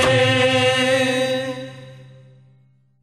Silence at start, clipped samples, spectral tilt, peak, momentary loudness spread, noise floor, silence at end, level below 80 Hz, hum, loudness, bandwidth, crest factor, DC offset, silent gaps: 0 s; under 0.1%; -4 dB/octave; -6 dBFS; 15 LU; -56 dBFS; 0.95 s; -54 dBFS; none; -17 LUFS; 12.5 kHz; 14 dB; under 0.1%; none